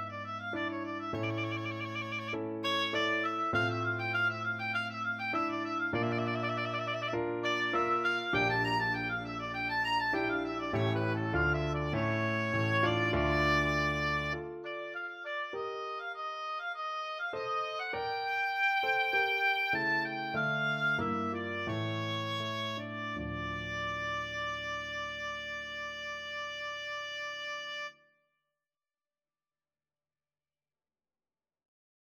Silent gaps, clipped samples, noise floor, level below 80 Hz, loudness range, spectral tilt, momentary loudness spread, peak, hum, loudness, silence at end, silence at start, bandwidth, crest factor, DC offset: none; under 0.1%; under -90 dBFS; -54 dBFS; 8 LU; -5.5 dB/octave; 9 LU; -16 dBFS; none; -33 LUFS; 4.2 s; 0 s; 15.5 kHz; 18 dB; under 0.1%